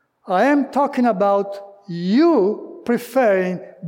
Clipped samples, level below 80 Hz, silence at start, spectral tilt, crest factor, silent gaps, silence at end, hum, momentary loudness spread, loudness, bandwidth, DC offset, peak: under 0.1%; -72 dBFS; 0.25 s; -7 dB/octave; 12 dB; none; 0 s; none; 12 LU; -18 LUFS; 17 kHz; under 0.1%; -6 dBFS